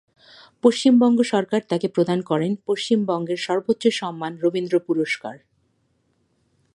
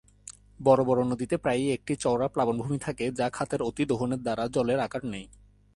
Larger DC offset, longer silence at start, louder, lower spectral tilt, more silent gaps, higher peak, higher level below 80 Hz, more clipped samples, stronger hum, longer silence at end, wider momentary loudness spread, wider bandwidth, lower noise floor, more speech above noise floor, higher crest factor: neither; first, 0.65 s vs 0.25 s; first, -21 LUFS vs -28 LUFS; about the same, -5.5 dB/octave vs -6 dB/octave; neither; first, -2 dBFS vs -8 dBFS; second, -72 dBFS vs -56 dBFS; neither; neither; first, 1.4 s vs 0.5 s; about the same, 9 LU vs 11 LU; about the same, 11 kHz vs 11.5 kHz; first, -67 dBFS vs -50 dBFS; first, 47 dB vs 23 dB; about the same, 20 dB vs 20 dB